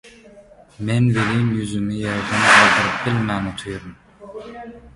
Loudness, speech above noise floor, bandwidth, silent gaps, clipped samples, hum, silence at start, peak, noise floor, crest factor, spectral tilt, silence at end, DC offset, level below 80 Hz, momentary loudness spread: -17 LUFS; 28 dB; 11.5 kHz; none; under 0.1%; none; 0.05 s; 0 dBFS; -46 dBFS; 20 dB; -4.5 dB/octave; 0.05 s; under 0.1%; -48 dBFS; 24 LU